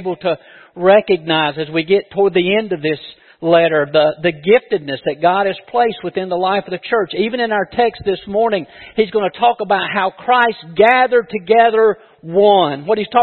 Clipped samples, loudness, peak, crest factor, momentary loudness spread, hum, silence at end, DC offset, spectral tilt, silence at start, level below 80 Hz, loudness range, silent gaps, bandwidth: under 0.1%; -15 LUFS; 0 dBFS; 16 dB; 9 LU; none; 0 s; under 0.1%; -8 dB/octave; 0 s; -56 dBFS; 4 LU; none; 4.4 kHz